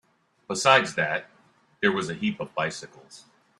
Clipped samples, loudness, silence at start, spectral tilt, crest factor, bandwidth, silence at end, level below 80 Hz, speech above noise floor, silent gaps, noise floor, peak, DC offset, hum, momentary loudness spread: under 0.1%; -25 LUFS; 0.5 s; -3.5 dB/octave; 26 dB; 13 kHz; 0.4 s; -68 dBFS; 36 dB; none; -61 dBFS; -2 dBFS; under 0.1%; none; 14 LU